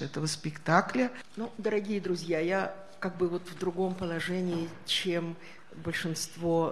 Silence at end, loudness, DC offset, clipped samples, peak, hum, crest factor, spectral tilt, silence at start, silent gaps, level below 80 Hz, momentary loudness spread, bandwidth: 0 s; -32 LUFS; 0.4%; under 0.1%; -8 dBFS; none; 24 dB; -5 dB/octave; 0 s; none; -66 dBFS; 11 LU; 13 kHz